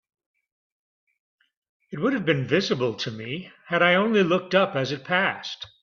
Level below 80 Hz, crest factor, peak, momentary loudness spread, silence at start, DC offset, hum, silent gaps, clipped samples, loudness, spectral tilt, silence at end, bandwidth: -66 dBFS; 20 dB; -6 dBFS; 14 LU; 1.9 s; under 0.1%; none; none; under 0.1%; -23 LUFS; -5.5 dB/octave; 0.15 s; 7.2 kHz